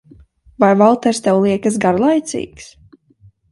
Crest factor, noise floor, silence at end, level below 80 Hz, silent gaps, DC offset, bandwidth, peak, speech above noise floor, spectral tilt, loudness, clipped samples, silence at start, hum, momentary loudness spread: 16 dB; -50 dBFS; 0.9 s; -52 dBFS; none; under 0.1%; 11.5 kHz; 0 dBFS; 36 dB; -6 dB/octave; -15 LUFS; under 0.1%; 0.6 s; none; 13 LU